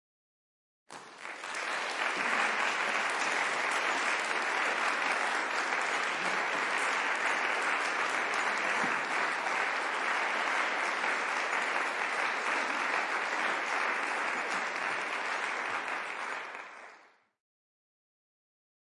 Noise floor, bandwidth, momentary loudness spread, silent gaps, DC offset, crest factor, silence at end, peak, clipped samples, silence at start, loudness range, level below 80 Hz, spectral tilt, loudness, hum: -60 dBFS; 11.5 kHz; 6 LU; none; under 0.1%; 16 dB; 2 s; -16 dBFS; under 0.1%; 0.9 s; 5 LU; under -90 dBFS; -0.5 dB/octave; -30 LUFS; none